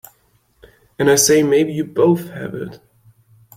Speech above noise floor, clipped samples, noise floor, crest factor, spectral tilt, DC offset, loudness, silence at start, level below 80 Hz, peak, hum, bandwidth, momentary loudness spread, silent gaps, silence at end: 43 dB; under 0.1%; -59 dBFS; 18 dB; -4 dB/octave; under 0.1%; -16 LUFS; 1 s; -56 dBFS; -2 dBFS; none; 16.5 kHz; 17 LU; none; 0.8 s